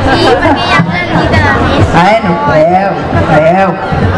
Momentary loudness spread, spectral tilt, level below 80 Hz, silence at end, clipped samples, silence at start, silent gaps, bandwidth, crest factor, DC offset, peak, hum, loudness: 4 LU; -6.5 dB/octave; -24 dBFS; 0 s; 3%; 0 s; none; 11 kHz; 8 dB; under 0.1%; 0 dBFS; none; -8 LUFS